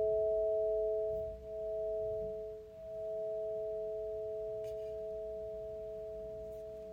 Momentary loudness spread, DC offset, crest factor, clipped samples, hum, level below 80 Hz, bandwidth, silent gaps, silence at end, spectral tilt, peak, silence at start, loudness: 12 LU; under 0.1%; 12 dB; under 0.1%; none; -60 dBFS; 7.2 kHz; none; 0 s; -7.5 dB/octave; -26 dBFS; 0 s; -39 LUFS